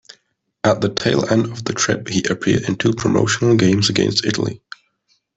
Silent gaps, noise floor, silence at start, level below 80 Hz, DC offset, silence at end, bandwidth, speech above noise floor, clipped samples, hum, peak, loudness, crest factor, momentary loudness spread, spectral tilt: none; -65 dBFS; 0.65 s; -50 dBFS; under 0.1%; 0.8 s; 8.4 kHz; 48 dB; under 0.1%; none; -2 dBFS; -18 LUFS; 16 dB; 6 LU; -4.5 dB/octave